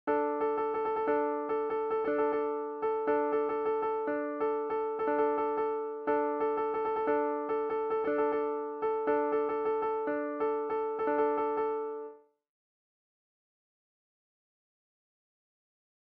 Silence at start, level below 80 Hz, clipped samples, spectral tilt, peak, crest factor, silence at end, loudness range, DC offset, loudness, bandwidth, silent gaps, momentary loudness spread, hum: 0.05 s; -72 dBFS; under 0.1%; -4 dB/octave; -18 dBFS; 14 dB; 3.8 s; 4 LU; under 0.1%; -31 LUFS; 4.6 kHz; none; 4 LU; none